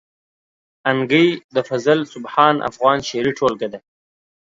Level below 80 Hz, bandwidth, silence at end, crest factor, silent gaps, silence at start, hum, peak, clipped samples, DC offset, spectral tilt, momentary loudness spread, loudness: -60 dBFS; 7.8 kHz; 0.65 s; 20 dB; 1.44-1.49 s; 0.85 s; none; 0 dBFS; under 0.1%; under 0.1%; -5.5 dB/octave; 9 LU; -18 LUFS